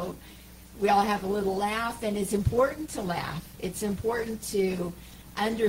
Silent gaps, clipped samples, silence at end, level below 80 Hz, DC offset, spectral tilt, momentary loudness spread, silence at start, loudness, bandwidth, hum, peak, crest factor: none; under 0.1%; 0 s; -48 dBFS; under 0.1%; -5 dB/octave; 15 LU; 0 s; -29 LUFS; 16 kHz; none; -12 dBFS; 18 dB